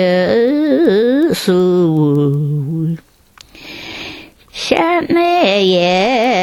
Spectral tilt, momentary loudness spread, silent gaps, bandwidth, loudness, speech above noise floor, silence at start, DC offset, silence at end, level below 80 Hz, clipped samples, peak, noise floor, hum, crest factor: -6 dB/octave; 16 LU; none; 15.5 kHz; -13 LUFS; 33 dB; 0 s; under 0.1%; 0 s; -50 dBFS; under 0.1%; 0 dBFS; -45 dBFS; none; 14 dB